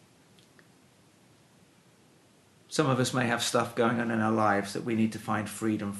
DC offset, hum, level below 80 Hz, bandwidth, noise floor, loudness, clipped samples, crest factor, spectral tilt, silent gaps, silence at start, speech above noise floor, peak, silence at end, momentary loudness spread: under 0.1%; none; -72 dBFS; 12 kHz; -61 dBFS; -28 LUFS; under 0.1%; 20 dB; -5 dB/octave; none; 2.7 s; 33 dB; -10 dBFS; 0 s; 5 LU